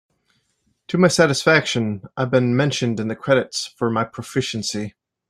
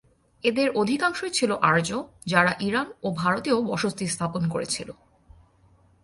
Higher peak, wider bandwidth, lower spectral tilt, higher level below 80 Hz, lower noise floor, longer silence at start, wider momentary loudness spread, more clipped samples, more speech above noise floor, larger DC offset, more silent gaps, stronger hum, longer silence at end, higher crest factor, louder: first, -2 dBFS vs -6 dBFS; first, 15 kHz vs 11.5 kHz; about the same, -5 dB/octave vs -4.5 dB/octave; about the same, -58 dBFS vs -58 dBFS; first, -68 dBFS vs -59 dBFS; first, 0.9 s vs 0.45 s; about the same, 11 LU vs 9 LU; neither; first, 48 dB vs 34 dB; neither; neither; neither; second, 0.4 s vs 1.1 s; about the same, 18 dB vs 20 dB; first, -20 LUFS vs -25 LUFS